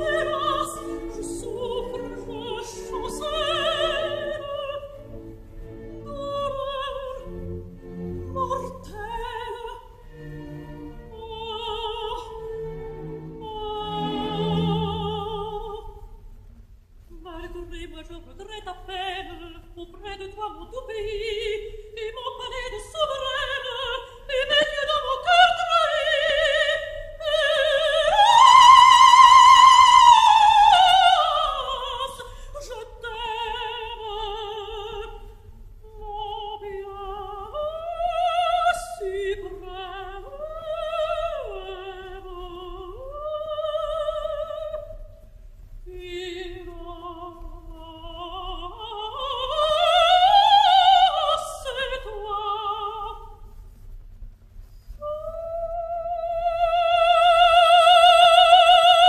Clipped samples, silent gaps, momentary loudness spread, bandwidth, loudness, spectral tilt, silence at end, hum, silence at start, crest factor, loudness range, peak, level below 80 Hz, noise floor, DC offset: under 0.1%; none; 25 LU; 14 kHz; -19 LUFS; -2.5 dB/octave; 0 s; none; 0 s; 20 dB; 21 LU; -2 dBFS; -44 dBFS; -48 dBFS; under 0.1%